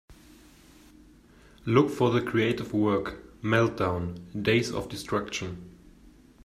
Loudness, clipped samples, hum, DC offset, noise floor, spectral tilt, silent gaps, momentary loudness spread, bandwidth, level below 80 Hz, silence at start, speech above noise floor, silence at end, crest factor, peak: -27 LUFS; under 0.1%; none; under 0.1%; -55 dBFS; -6 dB/octave; none; 12 LU; 14.5 kHz; -54 dBFS; 0.1 s; 28 dB; 0.35 s; 22 dB; -6 dBFS